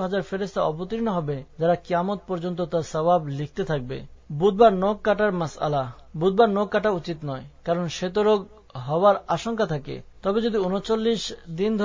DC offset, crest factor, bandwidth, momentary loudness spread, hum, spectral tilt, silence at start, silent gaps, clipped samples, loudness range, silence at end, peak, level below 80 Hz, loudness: under 0.1%; 20 dB; 7.6 kHz; 12 LU; none; -6.5 dB/octave; 0 s; none; under 0.1%; 3 LU; 0 s; -4 dBFS; -50 dBFS; -24 LUFS